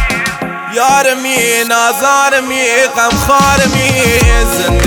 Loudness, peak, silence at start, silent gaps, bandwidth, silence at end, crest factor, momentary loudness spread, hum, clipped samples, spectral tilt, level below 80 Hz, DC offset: -10 LUFS; 0 dBFS; 0 s; none; over 20 kHz; 0 s; 10 dB; 5 LU; none; 0.2%; -3.5 dB/octave; -20 dBFS; under 0.1%